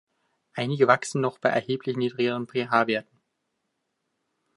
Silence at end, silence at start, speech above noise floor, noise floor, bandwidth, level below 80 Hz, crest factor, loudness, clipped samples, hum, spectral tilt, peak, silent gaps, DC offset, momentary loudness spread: 1.55 s; 0.55 s; 54 dB; -78 dBFS; 11.5 kHz; -74 dBFS; 22 dB; -25 LUFS; under 0.1%; none; -5.5 dB/octave; -4 dBFS; none; under 0.1%; 9 LU